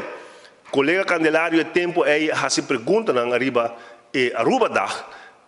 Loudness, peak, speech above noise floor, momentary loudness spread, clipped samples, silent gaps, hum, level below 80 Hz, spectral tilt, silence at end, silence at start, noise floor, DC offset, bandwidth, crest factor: -20 LUFS; -6 dBFS; 25 dB; 9 LU; under 0.1%; none; none; -70 dBFS; -4 dB/octave; 0.2 s; 0 s; -45 dBFS; under 0.1%; 11.5 kHz; 16 dB